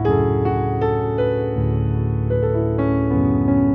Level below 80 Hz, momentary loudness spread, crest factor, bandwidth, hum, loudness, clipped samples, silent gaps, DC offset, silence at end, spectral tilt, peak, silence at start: -32 dBFS; 3 LU; 12 dB; 3.8 kHz; none; -20 LUFS; under 0.1%; none; under 0.1%; 0 s; -12 dB/octave; -6 dBFS; 0 s